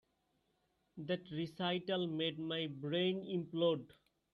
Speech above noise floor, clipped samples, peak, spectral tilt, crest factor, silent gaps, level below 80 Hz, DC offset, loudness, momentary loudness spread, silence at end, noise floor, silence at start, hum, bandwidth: 42 dB; under 0.1%; -22 dBFS; -7.5 dB/octave; 18 dB; none; -80 dBFS; under 0.1%; -39 LUFS; 7 LU; 0.4 s; -80 dBFS; 0.95 s; none; 11 kHz